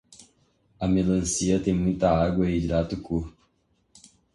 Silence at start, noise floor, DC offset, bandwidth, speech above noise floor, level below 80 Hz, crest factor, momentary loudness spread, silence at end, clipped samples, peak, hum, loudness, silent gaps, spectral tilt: 0.2 s; -69 dBFS; under 0.1%; 11.5 kHz; 45 dB; -42 dBFS; 18 dB; 9 LU; 1.05 s; under 0.1%; -8 dBFS; none; -25 LUFS; none; -6 dB/octave